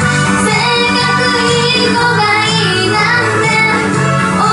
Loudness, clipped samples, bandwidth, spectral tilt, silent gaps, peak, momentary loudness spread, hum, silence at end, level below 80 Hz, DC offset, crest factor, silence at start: -10 LUFS; under 0.1%; 11.5 kHz; -4 dB/octave; none; 0 dBFS; 1 LU; none; 0 s; -40 dBFS; under 0.1%; 10 dB; 0 s